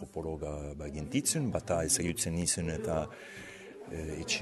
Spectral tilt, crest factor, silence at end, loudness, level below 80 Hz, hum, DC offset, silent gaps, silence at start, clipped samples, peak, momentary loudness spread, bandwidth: -3.5 dB/octave; 20 dB; 0 s; -33 LUFS; -48 dBFS; none; under 0.1%; none; 0 s; under 0.1%; -16 dBFS; 17 LU; 12.5 kHz